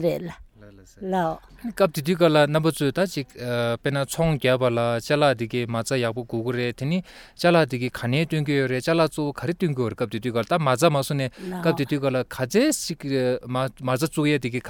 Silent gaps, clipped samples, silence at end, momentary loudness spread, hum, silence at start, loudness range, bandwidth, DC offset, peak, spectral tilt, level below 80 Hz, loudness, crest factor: none; under 0.1%; 0 s; 8 LU; none; 0 s; 2 LU; 19 kHz; under 0.1%; -4 dBFS; -5.5 dB/octave; -52 dBFS; -23 LUFS; 18 dB